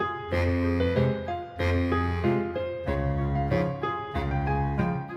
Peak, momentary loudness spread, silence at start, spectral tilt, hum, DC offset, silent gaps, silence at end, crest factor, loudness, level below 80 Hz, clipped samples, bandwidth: -12 dBFS; 6 LU; 0 s; -8.5 dB/octave; none; under 0.1%; none; 0 s; 16 dB; -27 LUFS; -38 dBFS; under 0.1%; 6.8 kHz